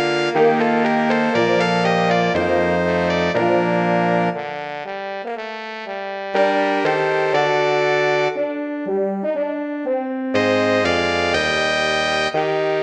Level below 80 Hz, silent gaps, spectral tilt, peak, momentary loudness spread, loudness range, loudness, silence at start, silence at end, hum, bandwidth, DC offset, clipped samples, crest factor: -48 dBFS; none; -5.5 dB/octave; -4 dBFS; 10 LU; 4 LU; -19 LUFS; 0 s; 0 s; none; 10 kHz; under 0.1%; under 0.1%; 16 dB